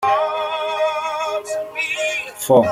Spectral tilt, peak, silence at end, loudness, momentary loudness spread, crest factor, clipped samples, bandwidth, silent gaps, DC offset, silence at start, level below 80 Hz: -3.5 dB/octave; -2 dBFS; 0 s; -20 LUFS; 8 LU; 18 dB; under 0.1%; 16 kHz; none; under 0.1%; 0 s; -62 dBFS